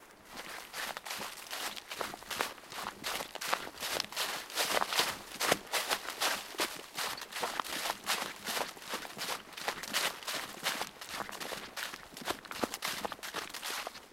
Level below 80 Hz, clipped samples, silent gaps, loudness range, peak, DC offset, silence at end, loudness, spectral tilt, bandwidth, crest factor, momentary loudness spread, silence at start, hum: -68 dBFS; under 0.1%; none; 5 LU; -12 dBFS; under 0.1%; 0 s; -36 LUFS; -0.5 dB/octave; 16.5 kHz; 26 dB; 9 LU; 0 s; none